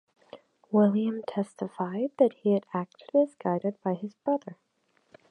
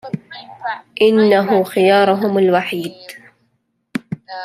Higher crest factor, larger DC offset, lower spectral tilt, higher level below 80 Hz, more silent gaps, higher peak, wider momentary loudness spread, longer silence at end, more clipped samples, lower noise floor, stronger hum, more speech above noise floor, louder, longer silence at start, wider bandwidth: first, 20 dB vs 14 dB; neither; first, -9 dB/octave vs -6.5 dB/octave; second, -80 dBFS vs -64 dBFS; neither; second, -8 dBFS vs -2 dBFS; second, 10 LU vs 17 LU; first, 0.75 s vs 0 s; neither; first, -70 dBFS vs -66 dBFS; neither; second, 42 dB vs 52 dB; second, -28 LUFS vs -15 LUFS; first, 0.35 s vs 0.05 s; second, 9.6 kHz vs 15 kHz